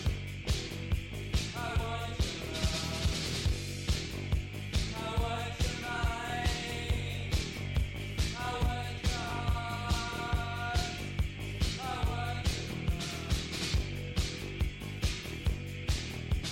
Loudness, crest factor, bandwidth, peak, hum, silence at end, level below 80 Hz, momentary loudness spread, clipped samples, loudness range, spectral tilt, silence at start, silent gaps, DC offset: -35 LUFS; 18 dB; 16.5 kHz; -16 dBFS; none; 0 s; -38 dBFS; 3 LU; under 0.1%; 1 LU; -4.5 dB/octave; 0 s; none; under 0.1%